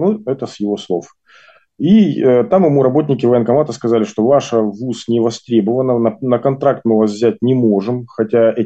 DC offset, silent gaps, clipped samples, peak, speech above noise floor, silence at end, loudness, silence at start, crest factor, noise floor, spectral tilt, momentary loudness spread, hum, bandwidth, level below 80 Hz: under 0.1%; none; under 0.1%; -2 dBFS; 33 dB; 0 s; -15 LUFS; 0 s; 12 dB; -47 dBFS; -7.5 dB/octave; 9 LU; none; 8.2 kHz; -58 dBFS